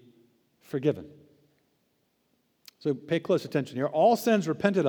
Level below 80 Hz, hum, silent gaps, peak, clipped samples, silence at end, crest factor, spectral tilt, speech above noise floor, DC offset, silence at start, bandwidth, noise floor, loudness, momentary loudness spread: -76 dBFS; none; none; -8 dBFS; under 0.1%; 0 s; 20 dB; -6.5 dB/octave; 46 dB; under 0.1%; 0.75 s; over 20 kHz; -72 dBFS; -27 LUFS; 11 LU